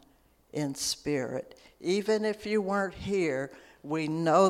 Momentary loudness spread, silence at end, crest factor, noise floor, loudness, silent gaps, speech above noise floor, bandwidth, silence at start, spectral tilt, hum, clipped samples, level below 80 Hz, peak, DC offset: 12 LU; 0 s; 20 dB; -64 dBFS; -31 LUFS; none; 35 dB; 16 kHz; 0.55 s; -4.5 dB/octave; none; under 0.1%; -60 dBFS; -10 dBFS; under 0.1%